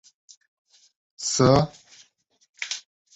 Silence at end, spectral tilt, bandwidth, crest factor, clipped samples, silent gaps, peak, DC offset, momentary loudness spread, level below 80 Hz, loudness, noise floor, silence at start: 0.35 s; -4.5 dB/octave; 8.2 kHz; 22 dB; under 0.1%; 2.49-2.54 s; -4 dBFS; under 0.1%; 15 LU; -50 dBFS; -23 LUFS; -60 dBFS; 1.2 s